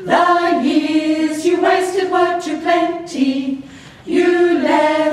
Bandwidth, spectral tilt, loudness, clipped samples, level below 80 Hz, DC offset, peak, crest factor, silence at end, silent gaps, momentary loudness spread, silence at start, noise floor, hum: 12.5 kHz; -4 dB/octave; -16 LUFS; under 0.1%; -58 dBFS; under 0.1%; -2 dBFS; 14 dB; 0 s; none; 7 LU; 0 s; -35 dBFS; none